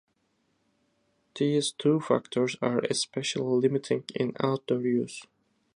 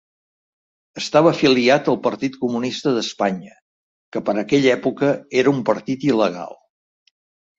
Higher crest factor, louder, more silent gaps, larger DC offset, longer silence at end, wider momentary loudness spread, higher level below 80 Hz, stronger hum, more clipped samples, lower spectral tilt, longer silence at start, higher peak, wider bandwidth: about the same, 20 dB vs 18 dB; second, -28 LUFS vs -19 LUFS; second, none vs 3.62-4.12 s; neither; second, 0.55 s vs 1.05 s; second, 5 LU vs 13 LU; second, -74 dBFS vs -62 dBFS; neither; neither; about the same, -5 dB/octave vs -5.5 dB/octave; first, 1.35 s vs 0.95 s; second, -8 dBFS vs -2 dBFS; first, 11.5 kHz vs 7.8 kHz